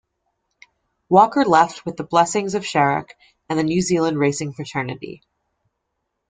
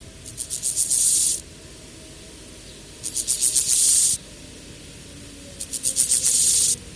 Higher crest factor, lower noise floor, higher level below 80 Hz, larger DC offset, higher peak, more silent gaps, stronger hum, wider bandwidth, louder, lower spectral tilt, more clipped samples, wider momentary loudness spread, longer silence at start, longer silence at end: about the same, 20 dB vs 20 dB; first, -76 dBFS vs -42 dBFS; second, -58 dBFS vs -50 dBFS; neither; about the same, 0 dBFS vs -2 dBFS; neither; neither; second, 9.6 kHz vs 11 kHz; about the same, -19 LUFS vs -18 LUFS; first, -5 dB/octave vs 0.5 dB/octave; neither; second, 12 LU vs 25 LU; first, 1.1 s vs 0 s; first, 1.15 s vs 0 s